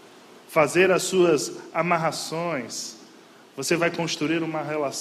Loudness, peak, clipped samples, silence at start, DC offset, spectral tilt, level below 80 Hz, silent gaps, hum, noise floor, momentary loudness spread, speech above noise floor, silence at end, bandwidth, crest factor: -24 LUFS; -6 dBFS; under 0.1%; 0.05 s; under 0.1%; -4 dB/octave; -68 dBFS; none; none; -50 dBFS; 12 LU; 27 dB; 0 s; 14.5 kHz; 20 dB